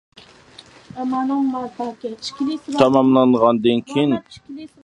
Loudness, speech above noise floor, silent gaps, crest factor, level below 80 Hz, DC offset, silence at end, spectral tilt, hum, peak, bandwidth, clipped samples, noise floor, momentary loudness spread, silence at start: -19 LUFS; 27 dB; none; 20 dB; -60 dBFS; under 0.1%; 0.2 s; -6.5 dB/octave; none; 0 dBFS; 10 kHz; under 0.1%; -46 dBFS; 16 LU; 0.95 s